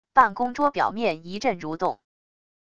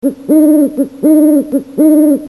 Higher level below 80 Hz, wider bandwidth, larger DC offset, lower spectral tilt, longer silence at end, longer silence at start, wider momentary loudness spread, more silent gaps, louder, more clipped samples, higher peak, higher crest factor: second, -60 dBFS vs -54 dBFS; second, 8.8 kHz vs 12.5 kHz; first, 0.5% vs under 0.1%; second, -5 dB/octave vs -7 dB/octave; first, 0.7 s vs 0 s; about the same, 0.05 s vs 0.05 s; first, 9 LU vs 6 LU; neither; second, -24 LUFS vs -10 LUFS; neither; about the same, -2 dBFS vs 0 dBFS; first, 22 dB vs 10 dB